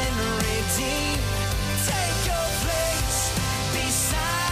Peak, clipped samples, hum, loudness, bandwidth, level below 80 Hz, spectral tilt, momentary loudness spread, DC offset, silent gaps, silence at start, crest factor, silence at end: -12 dBFS; under 0.1%; none; -24 LUFS; 16 kHz; -32 dBFS; -3 dB/octave; 3 LU; under 0.1%; none; 0 s; 14 dB; 0 s